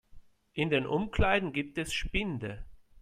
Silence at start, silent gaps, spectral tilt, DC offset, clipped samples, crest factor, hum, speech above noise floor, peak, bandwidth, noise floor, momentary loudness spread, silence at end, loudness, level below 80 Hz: 0.15 s; none; -5.5 dB/octave; under 0.1%; under 0.1%; 20 dB; none; 22 dB; -14 dBFS; 15.5 kHz; -53 dBFS; 13 LU; 0 s; -31 LUFS; -42 dBFS